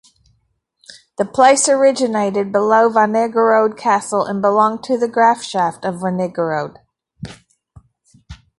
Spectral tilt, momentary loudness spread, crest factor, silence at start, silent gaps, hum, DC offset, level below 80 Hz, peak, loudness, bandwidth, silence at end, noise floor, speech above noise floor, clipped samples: -4 dB/octave; 12 LU; 16 dB; 0.9 s; none; none; under 0.1%; -54 dBFS; 0 dBFS; -15 LUFS; 11.5 kHz; 0.25 s; -65 dBFS; 50 dB; under 0.1%